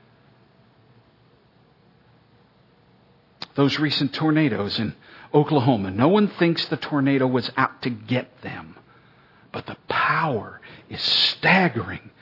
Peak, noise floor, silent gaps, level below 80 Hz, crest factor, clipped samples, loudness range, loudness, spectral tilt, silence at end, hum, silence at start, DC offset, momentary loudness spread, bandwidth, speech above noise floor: -4 dBFS; -57 dBFS; none; -64 dBFS; 20 dB; under 0.1%; 6 LU; -21 LUFS; -6.5 dB/octave; 0.15 s; none; 3.55 s; under 0.1%; 18 LU; 6 kHz; 35 dB